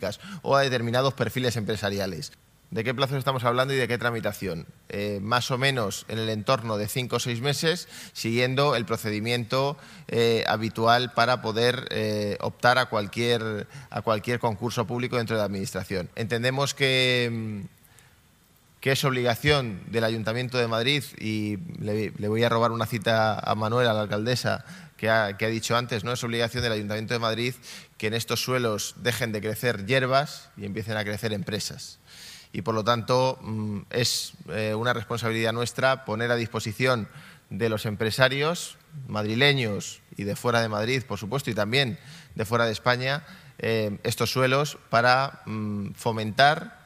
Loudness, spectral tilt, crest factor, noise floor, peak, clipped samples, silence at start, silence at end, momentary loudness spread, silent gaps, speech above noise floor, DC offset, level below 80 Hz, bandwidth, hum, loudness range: -26 LUFS; -4.5 dB/octave; 24 dB; -59 dBFS; -2 dBFS; under 0.1%; 0 s; 0.1 s; 11 LU; none; 33 dB; under 0.1%; -58 dBFS; 15.5 kHz; none; 3 LU